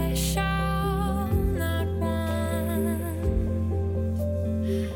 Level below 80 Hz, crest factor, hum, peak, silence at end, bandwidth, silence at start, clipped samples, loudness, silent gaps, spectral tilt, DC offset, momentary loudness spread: -34 dBFS; 12 dB; none; -12 dBFS; 0 s; 19 kHz; 0 s; under 0.1%; -27 LUFS; none; -6 dB/octave; under 0.1%; 2 LU